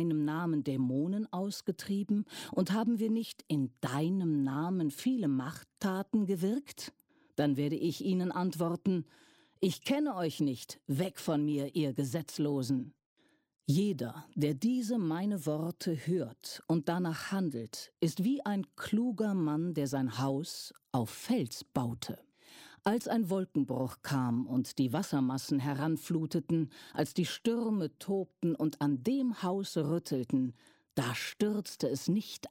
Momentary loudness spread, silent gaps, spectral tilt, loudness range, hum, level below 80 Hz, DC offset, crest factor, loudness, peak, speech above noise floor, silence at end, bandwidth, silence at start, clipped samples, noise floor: 6 LU; 13.06-13.16 s; -6.5 dB/octave; 2 LU; none; -74 dBFS; under 0.1%; 16 dB; -34 LUFS; -18 dBFS; 24 dB; 0 s; 16.5 kHz; 0 s; under 0.1%; -57 dBFS